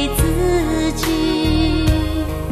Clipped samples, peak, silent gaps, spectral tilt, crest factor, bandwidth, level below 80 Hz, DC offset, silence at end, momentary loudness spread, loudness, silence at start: under 0.1%; -4 dBFS; none; -5.5 dB/octave; 14 dB; 14 kHz; -24 dBFS; under 0.1%; 0 s; 3 LU; -18 LUFS; 0 s